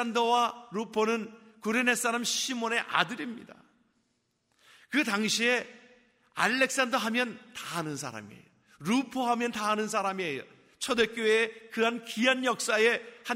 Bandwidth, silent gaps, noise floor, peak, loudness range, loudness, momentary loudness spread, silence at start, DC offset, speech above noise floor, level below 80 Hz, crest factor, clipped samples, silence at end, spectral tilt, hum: 16 kHz; none; -76 dBFS; -8 dBFS; 3 LU; -28 LUFS; 13 LU; 0 s; under 0.1%; 47 dB; -74 dBFS; 22 dB; under 0.1%; 0 s; -2.5 dB/octave; none